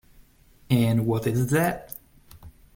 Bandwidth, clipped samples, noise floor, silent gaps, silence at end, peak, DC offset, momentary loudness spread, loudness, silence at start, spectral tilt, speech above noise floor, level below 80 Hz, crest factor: 17 kHz; under 0.1%; -55 dBFS; none; 0.25 s; -8 dBFS; under 0.1%; 17 LU; -24 LUFS; 0.7 s; -6.5 dB/octave; 32 dB; -52 dBFS; 18 dB